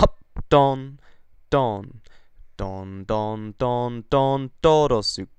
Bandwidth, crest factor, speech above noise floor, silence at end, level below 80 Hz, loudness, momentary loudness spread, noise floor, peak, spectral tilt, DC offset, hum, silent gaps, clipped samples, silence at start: 10.5 kHz; 20 dB; 24 dB; 0.1 s; -38 dBFS; -22 LUFS; 15 LU; -46 dBFS; -2 dBFS; -6 dB/octave; under 0.1%; none; none; under 0.1%; 0 s